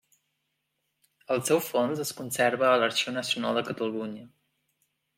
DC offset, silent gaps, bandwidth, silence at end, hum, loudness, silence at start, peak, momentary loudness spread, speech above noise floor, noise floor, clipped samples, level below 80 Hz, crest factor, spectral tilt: under 0.1%; none; 16.5 kHz; 0.9 s; none; -27 LUFS; 1.3 s; -10 dBFS; 10 LU; 52 dB; -79 dBFS; under 0.1%; -78 dBFS; 20 dB; -3.5 dB/octave